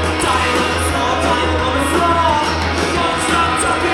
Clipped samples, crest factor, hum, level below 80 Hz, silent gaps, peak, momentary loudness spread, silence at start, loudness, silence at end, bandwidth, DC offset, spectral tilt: under 0.1%; 14 dB; none; -30 dBFS; none; -2 dBFS; 2 LU; 0 s; -15 LUFS; 0 s; 15.5 kHz; under 0.1%; -4 dB/octave